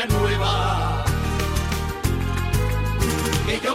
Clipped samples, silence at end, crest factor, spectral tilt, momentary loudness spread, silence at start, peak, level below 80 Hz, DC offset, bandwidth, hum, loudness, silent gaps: under 0.1%; 0 s; 14 dB; -5 dB/octave; 4 LU; 0 s; -8 dBFS; -28 dBFS; under 0.1%; 16 kHz; none; -23 LUFS; none